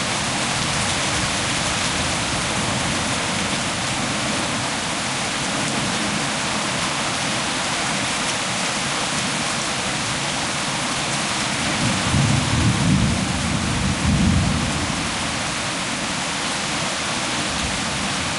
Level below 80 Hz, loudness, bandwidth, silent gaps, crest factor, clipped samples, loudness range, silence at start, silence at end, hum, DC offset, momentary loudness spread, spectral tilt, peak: -38 dBFS; -21 LUFS; 11.5 kHz; none; 16 dB; under 0.1%; 2 LU; 0 s; 0 s; none; under 0.1%; 4 LU; -3 dB/octave; -6 dBFS